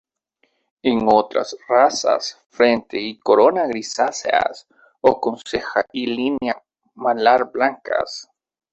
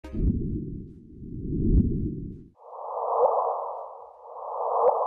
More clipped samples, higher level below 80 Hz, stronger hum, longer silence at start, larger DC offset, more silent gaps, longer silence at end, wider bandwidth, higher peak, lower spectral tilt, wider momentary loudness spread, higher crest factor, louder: neither; second, -58 dBFS vs -34 dBFS; neither; first, 0.85 s vs 0.05 s; neither; first, 2.46-2.50 s vs none; first, 0.5 s vs 0 s; first, 8.4 kHz vs 3 kHz; first, -2 dBFS vs -10 dBFS; second, -3.5 dB/octave vs -12.5 dB/octave; second, 10 LU vs 20 LU; about the same, 18 dB vs 18 dB; first, -19 LUFS vs -28 LUFS